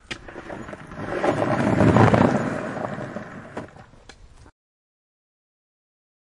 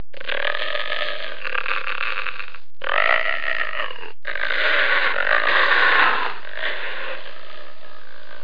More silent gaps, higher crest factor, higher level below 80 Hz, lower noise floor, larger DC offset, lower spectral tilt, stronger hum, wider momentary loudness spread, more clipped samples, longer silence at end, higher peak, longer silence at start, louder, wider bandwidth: neither; about the same, 22 dB vs 20 dB; first, -48 dBFS vs -60 dBFS; about the same, -47 dBFS vs -44 dBFS; second, under 0.1% vs 9%; first, -7.5 dB/octave vs -3.5 dB/octave; neither; first, 21 LU vs 17 LU; neither; first, 2.4 s vs 0 s; about the same, -2 dBFS vs -2 dBFS; about the same, 0.1 s vs 0.15 s; about the same, -21 LUFS vs -21 LUFS; first, 11 kHz vs 5.2 kHz